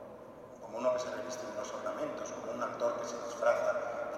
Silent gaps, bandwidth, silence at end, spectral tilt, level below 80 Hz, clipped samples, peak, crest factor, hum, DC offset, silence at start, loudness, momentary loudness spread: none; 14 kHz; 0 s; -3.5 dB/octave; -72 dBFS; under 0.1%; -16 dBFS; 20 dB; none; under 0.1%; 0 s; -36 LUFS; 15 LU